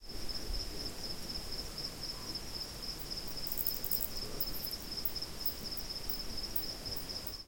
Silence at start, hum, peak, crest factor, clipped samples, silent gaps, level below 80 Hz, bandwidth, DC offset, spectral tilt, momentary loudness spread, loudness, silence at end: 0 s; none; -16 dBFS; 24 dB; under 0.1%; none; -48 dBFS; 17.5 kHz; under 0.1%; -2.5 dB/octave; 7 LU; -38 LUFS; 0 s